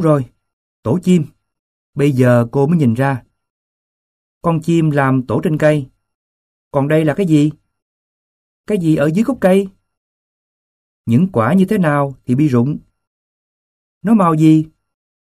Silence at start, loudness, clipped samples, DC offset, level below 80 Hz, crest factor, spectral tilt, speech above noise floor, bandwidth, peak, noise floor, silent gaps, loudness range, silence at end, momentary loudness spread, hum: 0 s; -15 LUFS; under 0.1%; under 0.1%; -52 dBFS; 16 dB; -8 dB/octave; over 77 dB; 14.5 kHz; 0 dBFS; under -90 dBFS; 0.53-0.83 s, 1.59-1.93 s, 3.50-4.41 s, 6.15-6.71 s, 7.82-8.64 s, 9.97-11.04 s, 13.07-14.01 s; 2 LU; 0.55 s; 12 LU; none